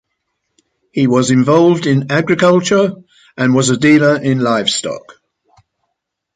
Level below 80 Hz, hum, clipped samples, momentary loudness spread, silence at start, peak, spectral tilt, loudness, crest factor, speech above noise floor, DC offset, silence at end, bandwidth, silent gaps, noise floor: -54 dBFS; none; under 0.1%; 9 LU; 0.95 s; 0 dBFS; -5 dB/octave; -12 LUFS; 14 dB; 62 dB; under 0.1%; 1.35 s; 9.4 kHz; none; -74 dBFS